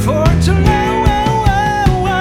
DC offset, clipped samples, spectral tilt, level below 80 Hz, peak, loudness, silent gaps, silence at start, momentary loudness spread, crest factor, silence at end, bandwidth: under 0.1%; under 0.1%; -6.5 dB/octave; -18 dBFS; 0 dBFS; -13 LUFS; none; 0 s; 2 LU; 12 dB; 0 s; 16 kHz